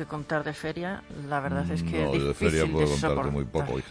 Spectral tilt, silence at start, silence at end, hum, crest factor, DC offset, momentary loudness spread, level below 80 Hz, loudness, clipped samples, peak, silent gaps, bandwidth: -6 dB/octave; 0 s; 0 s; none; 18 dB; under 0.1%; 8 LU; -42 dBFS; -28 LUFS; under 0.1%; -10 dBFS; none; 11 kHz